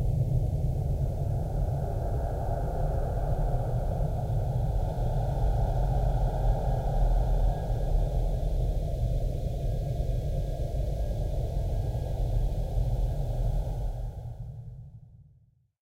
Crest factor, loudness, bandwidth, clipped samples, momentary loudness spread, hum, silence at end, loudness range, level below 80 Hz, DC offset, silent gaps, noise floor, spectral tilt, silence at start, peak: 14 dB; -31 LUFS; 8 kHz; under 0.1%; 4 LU; none; 0.6 s; 3 LU; -30 dBFS; under 0.1%; none; -62 dBFS; -8.5 dB/octave; 0 s; -14 dBFS